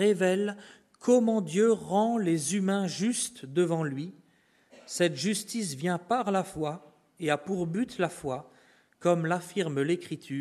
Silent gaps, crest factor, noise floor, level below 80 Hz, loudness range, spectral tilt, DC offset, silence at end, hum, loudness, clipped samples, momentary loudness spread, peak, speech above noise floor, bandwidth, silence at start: none; 18 dB; -66 dBFS; -70 dBFS; 5 LU; -5 dB/octave; under 0.1%; 0 s; none; -29 LUFS; under 0.1%; 10 LU; -12 dBFS; 37 dB; 13.5 kHz; 0 s